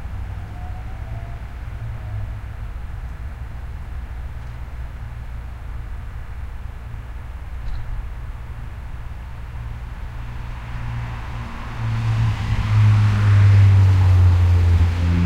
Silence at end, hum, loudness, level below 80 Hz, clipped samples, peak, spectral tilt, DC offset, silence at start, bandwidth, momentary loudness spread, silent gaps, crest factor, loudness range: 0 s; none; -19 LUFS; -30 dBFS; under 0.1%; -4 dBFS; -7.5 dB/octave; under 0.1%; 0 s; 7.2 kHz; 20 LU; none; 16 dB; 18 LU